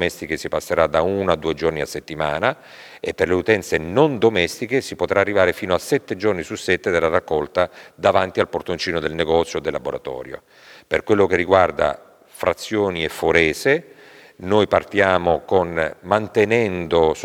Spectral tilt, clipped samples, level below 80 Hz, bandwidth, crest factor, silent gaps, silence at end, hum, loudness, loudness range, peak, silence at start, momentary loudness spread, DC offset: -5 dB/octave; under 0.1%; -46 dBFS; 17 kHz; 20 dB; none; 0 s; none; -20 LUFS; 3 LU; 0 dBFS; 0 s; 9 LU; under 0.1%